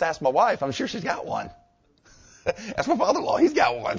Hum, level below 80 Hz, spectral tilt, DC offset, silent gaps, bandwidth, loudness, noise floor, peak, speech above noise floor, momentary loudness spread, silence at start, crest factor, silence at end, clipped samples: none; -56 dBFS; -4.5 dB/octave; under 0.1%; none; 7.6 kHz; -24 LUFS; -60 dBFS; -6 dBFS; 36 dB; 11 LU; 0 s; 18 dB; 0 s; under 0.1%